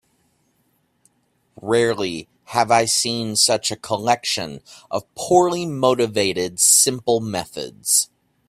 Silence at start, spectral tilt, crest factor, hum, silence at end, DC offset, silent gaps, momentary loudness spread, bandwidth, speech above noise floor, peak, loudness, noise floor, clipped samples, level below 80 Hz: 1.6 s; -2.5 dB/octave; 20 dB; none; 0.45 s; under 0.1%; none; 14 LU; 16 kHz; 46 dB; 0 dBFS; -18 LUFS; -65 dBFS; under 0.1%; -60 dBFS